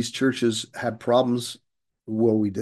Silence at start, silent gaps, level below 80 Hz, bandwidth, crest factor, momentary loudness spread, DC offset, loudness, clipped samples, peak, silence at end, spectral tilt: 0 s; none; -70 dBFS; 12.5 kHz; 16 dB; 11 LU; under 0.1%; -24 LUFS; under 0.1%; -8 dBFS; 0 s; -5 dB/octave